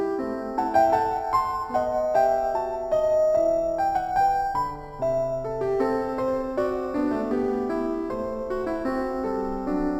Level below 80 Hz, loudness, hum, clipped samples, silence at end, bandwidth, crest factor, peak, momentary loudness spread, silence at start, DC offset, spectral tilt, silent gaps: -46 dBFS; -25 LUFS; none; under 0.1%; 0 s; 19 kHz; 16 dB; -8 dBFS; 7 LU; 0 s; under 0.1%; -7 dB/octave; none